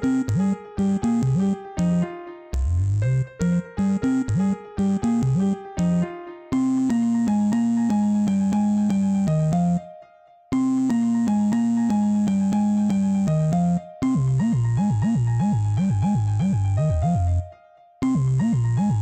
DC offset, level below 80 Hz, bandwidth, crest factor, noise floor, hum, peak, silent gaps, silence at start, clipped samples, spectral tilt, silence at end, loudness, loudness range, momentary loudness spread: under 0.1%; -40 dBFS; 9 kHz; 8 dB; -51 dBFS; none; -12 dBFS; none; 0 s; under 0.1%; -8.5 dB/octave; 0 s; -22 LUFS; 2 LU; 4 LU